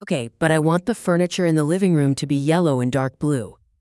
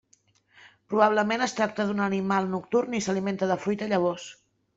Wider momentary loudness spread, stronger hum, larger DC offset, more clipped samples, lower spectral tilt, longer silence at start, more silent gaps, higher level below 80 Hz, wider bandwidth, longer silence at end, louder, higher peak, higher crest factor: about the same, 5 LU vs 6 LU; neither; neither; neither; about the same, -6.5 dB/octave vs -5.5 dB/octave; second, 0 s vs 0.65 s; neither; first, -56 dBFS vs -68 dBFS; first, 12 kHz vs 8 kHz; about the same, 0.45 s vs 0.45 s; first, -20 LUFS vs -26 LUFS; about the same, -4 dBFS vs -6 dBFS; about the same, 16 dB vs 20 dB